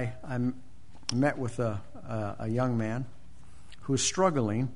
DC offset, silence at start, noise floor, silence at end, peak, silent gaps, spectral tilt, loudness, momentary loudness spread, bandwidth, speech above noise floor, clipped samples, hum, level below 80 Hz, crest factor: 1%; 0 s; -54 dBFS; 0 s; -12 dBFS; none; -5 dB/octave; -31 LUFS; 12 LU; 10.5 kHz; 24 dB; under 0.1%; none; -56 dBFS; 20 dB